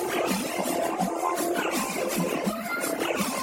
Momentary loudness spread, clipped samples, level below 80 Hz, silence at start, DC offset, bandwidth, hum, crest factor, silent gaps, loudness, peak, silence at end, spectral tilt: 2 LU; under 0.1%; -62 dBFS; 0 s; under 0.1%; 17 kHz; none; 16 dB; none; -27 LUFS; -12 dBFS; 0 s; -3.5 dB/octave